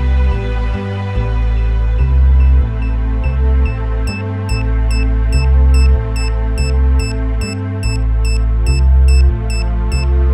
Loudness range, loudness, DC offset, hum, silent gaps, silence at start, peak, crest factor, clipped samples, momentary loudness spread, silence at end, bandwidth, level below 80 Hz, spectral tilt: 1 LU; -15 LUFS; under 0.1%; none; none; 0 s; -2 dBFS; 10 dB; under 0.1%; 8 LU; 0 s; 11 kHz; -12 dBFS; -6.5 dB/octave